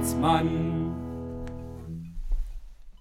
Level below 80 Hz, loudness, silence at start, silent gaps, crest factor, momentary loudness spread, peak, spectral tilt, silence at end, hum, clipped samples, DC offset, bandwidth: -36 dBFS; -30 LUFS; 0 s; none; 18 dB; 16 LU; -10 dBFS; -6 dB/octave; 0.05 s; none; under 0.1%; under 0.1%; 16 kHz